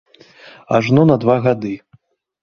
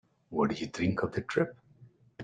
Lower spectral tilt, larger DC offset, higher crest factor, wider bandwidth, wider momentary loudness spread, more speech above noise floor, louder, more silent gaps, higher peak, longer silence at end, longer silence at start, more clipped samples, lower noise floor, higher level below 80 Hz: first, -8.5 dB/octave vs -6.5 dB/octave; neither; about the same, 16 dB vs 20 dB; second, 7 kHz vs 9.4 kHz; first, 13 LU vs 4 LU; first, 40 dB vs 28 dB; first, -15 LUFS vs -32 LUFS; neither; first, -2 dBFS vs -14 dBFS; first, 0.65 s vs 0 s; first, 0.45 s vs 0.3 s; neither; second, -54 dBFS vs -59 dBFS; first, -54 dBFS vs -62 dBFS